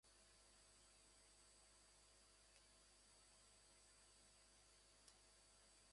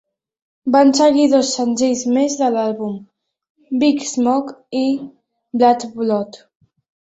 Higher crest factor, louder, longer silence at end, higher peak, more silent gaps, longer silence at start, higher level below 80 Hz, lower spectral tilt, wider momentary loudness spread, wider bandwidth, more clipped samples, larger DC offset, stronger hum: first, 26 dB vs 16 dB; second, -70 LUFS vs -17 LUFS; second, 0 s vs 0.65 s; second, -46 dBFS vs -2 dBFS; second, none vs 3.50-3.55 s; second, 0.05 s vs 0.65 s; second, -82 dBFS vs -62 dBFS; second, -1 dB/octave vs -4 dB/octave; second, 1 LU vs 14 LU; first, 11.5 kHz vs 8.2 kHz; neither; neither; first, 50 Hz at -80 dBFS vs none